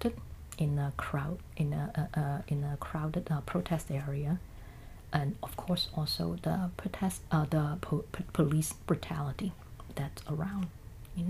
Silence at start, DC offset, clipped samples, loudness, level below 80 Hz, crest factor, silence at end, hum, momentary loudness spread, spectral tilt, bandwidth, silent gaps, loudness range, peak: 0 s; under 0.1%; under 0.1%; -34 LUFS; -50 dBFS; 22 dB; 0 s; none; 9 LU; -6 dB/octave; 15.5 kHz; none; 3 LU; -12 dBFS